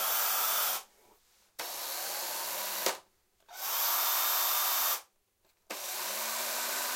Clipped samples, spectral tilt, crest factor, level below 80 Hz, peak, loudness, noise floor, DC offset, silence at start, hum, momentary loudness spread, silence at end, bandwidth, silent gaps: under 0.1%; 2.5 dB/octave; 22 dB; -82 dBFS; -12 dBFS; -30 LUFS; -73 dBFS; under 0.1%; 0 s; none; 13 LU; 0 s; 16.5 kHz; none